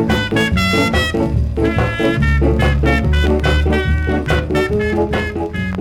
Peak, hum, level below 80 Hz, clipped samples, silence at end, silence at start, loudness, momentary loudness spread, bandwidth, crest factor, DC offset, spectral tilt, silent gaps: -4 dBFS; none; -20 dBFS; under 0.1%; 0 s; 0 s; -16 LUFS; 4 LU; 13.5 kHz; 12 dB; under 0.1%; -6.5 dB/octave; none